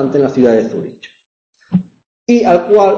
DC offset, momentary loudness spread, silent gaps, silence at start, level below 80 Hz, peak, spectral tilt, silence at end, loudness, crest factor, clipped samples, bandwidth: under 0.1%; 14 LU; 1.26-1.53 s, 2.06-2.26 s; 0 s; -50 dBFS; 0 dBFS; -7.5 dB/octave; 0 s; -12 LUFS; 12 dB; under 0.1%; 7.4 kHz